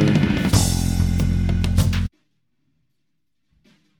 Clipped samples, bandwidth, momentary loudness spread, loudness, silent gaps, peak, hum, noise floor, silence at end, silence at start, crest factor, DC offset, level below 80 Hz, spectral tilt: under 0.1%; 19 kHz; 4 LU; -20 LUFS; none; -4 dBFS; none; -77 dBFS; 1.9 s; 0 s; 18 dB; under 0.1%; -28 dBFS; -5.5 dB/octave